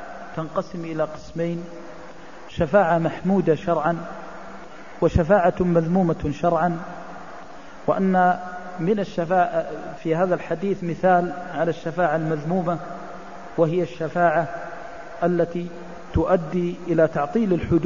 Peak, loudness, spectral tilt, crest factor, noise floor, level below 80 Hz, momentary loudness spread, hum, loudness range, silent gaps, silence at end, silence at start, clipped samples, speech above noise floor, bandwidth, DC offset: -4 dBFS; -22 LUFS; -8 dB/octave; 18 dB; -42 dBFS; -42 dBFS; 19 LU; none; 3 LU; none; 0 s; 0 s; under 0.1%; 20 dB; 7.4 kHz; 1%